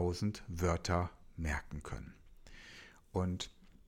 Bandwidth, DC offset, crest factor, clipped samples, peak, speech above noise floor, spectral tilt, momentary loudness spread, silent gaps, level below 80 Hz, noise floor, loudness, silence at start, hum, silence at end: 16 kHz; under 0.1%; 20 dB; under 0.1%; -20 dBFS; 20 dB; -5.5 dB/octave; 20 LU; none; -50 dBFS; -57 dBFS; -39 LUFS; 0 s; none; 0.05 s